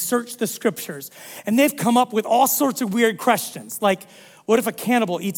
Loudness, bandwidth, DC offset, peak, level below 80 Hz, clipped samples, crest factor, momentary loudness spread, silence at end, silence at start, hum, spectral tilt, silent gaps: -20 LUFS; 18 kHz; under 0.1%; -4 dBFS; -70 dBFS; under 0.1%; 18 dB; 14 LU; 0 s; 0 s; none; -4 dB/octave; none